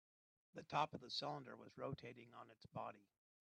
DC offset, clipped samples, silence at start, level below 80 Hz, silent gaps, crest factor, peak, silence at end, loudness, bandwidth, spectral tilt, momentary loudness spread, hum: under 0.1%; under 0.1%; 0.55 s; -84 dBFS; none; 26 dB; -26 dBFS; 0.4 s; -49 LUFS; 9.6 kHz; -5 dB/octave; 18 LU; none